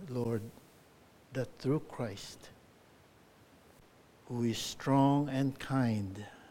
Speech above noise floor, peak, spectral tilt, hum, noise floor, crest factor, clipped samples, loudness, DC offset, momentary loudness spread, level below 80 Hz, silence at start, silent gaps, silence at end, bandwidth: 28 dB; -18 dBFS; -6.5 dB/octave; none; -62 dBFS; 18 dB; under 0.1%; -34 LUFS; under 0.1%; 18 LU; -66 dBFS; 0 s; none; 0 s; 16.5 kHz